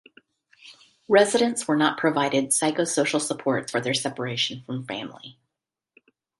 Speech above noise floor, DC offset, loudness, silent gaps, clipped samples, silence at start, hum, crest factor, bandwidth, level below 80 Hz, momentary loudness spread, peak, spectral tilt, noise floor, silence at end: 62 dB; under 0.1%; -23 LUFS; none; under 0.1%; 0.65 s; none; 20 dB; 12 kHz; -70 dBFS; 13 LU; -4 dBFS; -3.5 dB/octave; -86 dBFS; 1.1 s